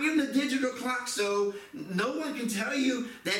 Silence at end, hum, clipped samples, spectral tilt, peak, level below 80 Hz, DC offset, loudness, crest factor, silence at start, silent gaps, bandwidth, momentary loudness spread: 0 s; none; under 0.1%; -3.5 dB/octave; -16 dBFS; -72 dBFS; under 0.1%; -30 LUFS; 14 dB; 0 s; none; 16.5 kHz; 6 LU